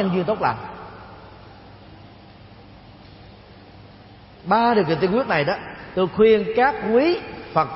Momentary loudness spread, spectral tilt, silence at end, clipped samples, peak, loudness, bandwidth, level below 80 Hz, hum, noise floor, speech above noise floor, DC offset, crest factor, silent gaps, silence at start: 22 LU; -10.5 dB/octave; 0 s; under 0.1%; -4 dBFS; -20 LUFS; 5.8 kHz; -52 dBFS; none; -45 dBFS; 26 dB; under 0.1%; 18 dB; none; 0 s